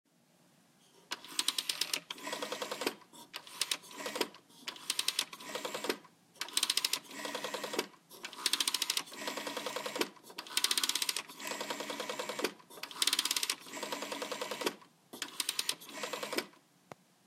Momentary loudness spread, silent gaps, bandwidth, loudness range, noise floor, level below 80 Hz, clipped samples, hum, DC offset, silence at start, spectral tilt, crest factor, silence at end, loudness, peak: 14 LU; none; 17 kHz; 4 LU; -68 dBFS; -90 dBFS; under 0.1%; none; under 0.1%; 0.95 s; 0 dB/octave; 30 dB; 0.75 s; -36 LUFS; -10 dBFS